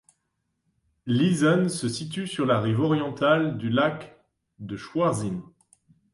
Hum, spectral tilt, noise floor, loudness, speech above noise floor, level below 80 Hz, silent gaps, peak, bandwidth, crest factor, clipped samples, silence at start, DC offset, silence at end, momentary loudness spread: none; -6 dB/octave; -77 dBFS; -24 LUFS; 53 dB; -62 dBFS; none; -8 dBFS; 11.5 kHz; 18 dB; under 0.1%; 1.05 s; under 0.1%; 0.7 s; 16 LU